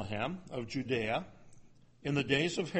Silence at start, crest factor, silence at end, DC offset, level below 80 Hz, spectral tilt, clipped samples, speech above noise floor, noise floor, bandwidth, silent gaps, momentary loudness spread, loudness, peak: 0 s; 22 dB; 0 s; under 0.1%; -60 dBFS; -5 dB/octave; under 0.1%; 24 dB; -58 dBFS; 8.4 kHz; none; 11 LU; -35 LUFS; -12 dBFS